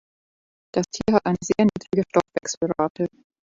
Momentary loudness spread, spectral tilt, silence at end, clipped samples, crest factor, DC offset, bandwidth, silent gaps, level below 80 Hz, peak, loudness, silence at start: 7 LU; -5.5 dB/octave; 0.35 s; under 0.1%; 20 dB; under 0.1%; 7.8 kHz; 2.57-2.61 s, 2.90-2.95 s; -54 dBFS; -4 dBFS; -23 LUFS; 0.75 s